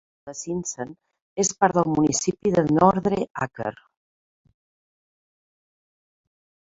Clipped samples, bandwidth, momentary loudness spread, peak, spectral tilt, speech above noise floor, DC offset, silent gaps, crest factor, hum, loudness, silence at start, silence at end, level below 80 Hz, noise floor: under 0.1%; 8 kHz; 17 LU; -2 dBFS; -5 dB/octave; over 68 dB; under 0.1%; 1.22-1.36 s, 3.31-3.35 s; 22 dB; none; -23 LUFS; 0.25 s; 3 s; -58 dBFS; under -90 dBFS